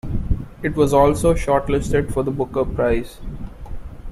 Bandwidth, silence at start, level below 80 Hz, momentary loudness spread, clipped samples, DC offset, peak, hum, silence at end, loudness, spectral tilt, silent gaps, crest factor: 14.5 kHz; 0.05 s; -30 dBFS; 21 LU; under 0.1%; under 0.1%; -2 dBFS; none; 0 s; -20 LUFS; -7 dB/octave; none; 18 dB